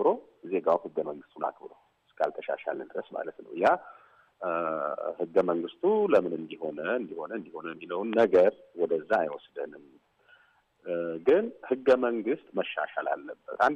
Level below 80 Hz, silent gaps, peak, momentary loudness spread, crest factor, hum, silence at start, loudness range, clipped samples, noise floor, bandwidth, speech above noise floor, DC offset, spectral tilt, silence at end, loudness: -74 dBFS; none; -12 dBFS; 14 LU; 16 dB; none; 0 s; 5 LU; under 0.1%; -65 dBFS; 8.4 kHz; 36 dB; under 0.1%; -7 dB/octave; 0 s; -29 LUFS